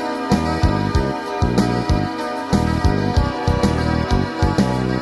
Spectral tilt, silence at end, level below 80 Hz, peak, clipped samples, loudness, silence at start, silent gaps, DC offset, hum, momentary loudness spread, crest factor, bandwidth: -6.5 dB/octave; 0 s; -26 dBFS; -2 dBFS; under 0.1%; -19 LUFS; 0 s; none; under 0.1%; none; 3 LU; 16 dB; 12.5 kHz